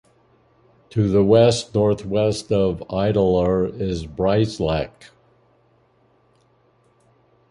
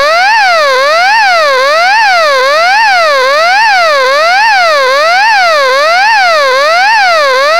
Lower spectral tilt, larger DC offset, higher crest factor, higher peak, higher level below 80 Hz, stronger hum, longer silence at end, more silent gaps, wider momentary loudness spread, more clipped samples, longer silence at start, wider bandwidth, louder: first, -6.5 dB/octave vs 0.5 dB/octave; second, under 0.1% vs 2%; first, 20 dB vs 6 dB; about the same, -2 dBFS vs 0 dBFS; first, -42 dBFS vs -52 dBFS; neither; first, 2.65 s vs 0 s; neither; first, 10 LU vs 1 LU; second, under 0.1% vs 20%; first, 0.9 s vs 0 s; first, 11.5 kHz vs 5.4 kHz; second, -20 LUFS vs -5 LUFS